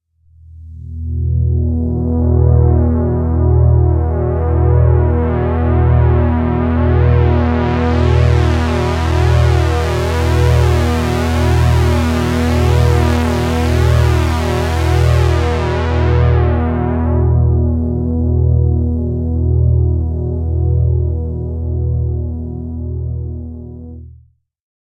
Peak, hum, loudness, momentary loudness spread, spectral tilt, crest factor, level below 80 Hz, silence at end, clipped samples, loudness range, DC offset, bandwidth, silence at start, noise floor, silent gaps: 0 dBFS; none; -14 LUFS; 9 LU; -7.5 dB/octave; 12 dB; -22 dBFS; 0.75 s; under 0.1%; 4 LU; under 0.1%; 11 kHz; 0.55 s; -47 dBFS; none